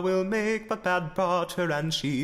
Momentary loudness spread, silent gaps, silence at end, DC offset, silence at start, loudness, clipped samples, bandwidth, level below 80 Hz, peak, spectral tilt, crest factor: 2 LU; none; 0 s; under 0.1%; 0 s; -27 LUFS; under 0.1%; 16 kHz; -56 dBFS; -14 dBFS; -5 dB/octave; 14 dB